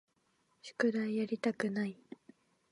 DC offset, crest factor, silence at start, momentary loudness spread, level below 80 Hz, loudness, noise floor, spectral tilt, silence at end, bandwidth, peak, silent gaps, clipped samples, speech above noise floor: under 0.1%; 20 dB; 0.65 s; 21 LU; -86 dBFS; -35 LUFS; -76 dBFS; -6 dB/octave; 0.8 s; 11 kHz; -18 dBFS; none; under 0.1%; 41 dB